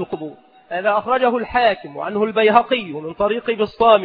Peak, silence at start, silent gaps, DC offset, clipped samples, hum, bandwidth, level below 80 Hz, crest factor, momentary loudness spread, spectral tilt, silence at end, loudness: 0 dBFS; 0 s; none; under 0.1%; under 0.1%; none; 5.2 kHz; -52 dBFS; 18 dB; 14 LU; -7.5 dB/octave; 0 s; -18 LUFS